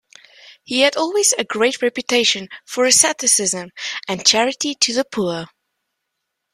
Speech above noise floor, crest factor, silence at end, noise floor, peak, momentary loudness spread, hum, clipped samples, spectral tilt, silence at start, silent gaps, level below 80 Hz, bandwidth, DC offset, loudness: 59 dB; 20 dB; 1.1 s; -77 dBFS; 0 dBFS; 11 LU; none; under 0.1%; -1 dB/octave; 0.45 s; none; -64 dBFS; 16 kHz; under 0.1%; -16 LUFS